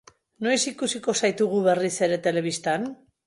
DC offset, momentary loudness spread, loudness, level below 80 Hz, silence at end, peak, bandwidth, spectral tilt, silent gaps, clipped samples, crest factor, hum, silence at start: under 0.1%; 6 LU; -24 LUFS; -70 dBFS; 0.3 s; -8 dBFS; 11.5 kHz; -3.5 dB/octave; none; under 0.1%; 16 dB; none; 0.4 s